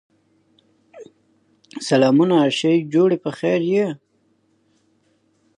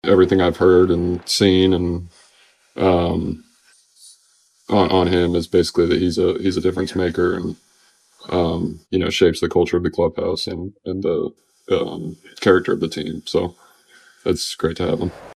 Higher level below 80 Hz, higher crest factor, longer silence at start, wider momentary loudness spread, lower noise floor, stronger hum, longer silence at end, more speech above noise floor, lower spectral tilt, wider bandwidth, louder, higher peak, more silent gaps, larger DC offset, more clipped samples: second, -72 dBFS vs -44 dBFS; about the same, 18 dB vs 18 dB; first, 0.95 s vs 0.05 s; about the same, 14 LU vs 13 LU; first, -63 dBFS vs -58 dBFS; neither; first, 1.6 s vs 0 s; first, 46 dB vs 40 dB; about the same, -6 dB/octave vs -5.5 dB/octave; second, 10.5 kHz vs 14.5 kHz; about the same, -18 LUFS vs -19 LUFS; about the same, -4 dBFS vs -2 dBFS; neither; neither; neither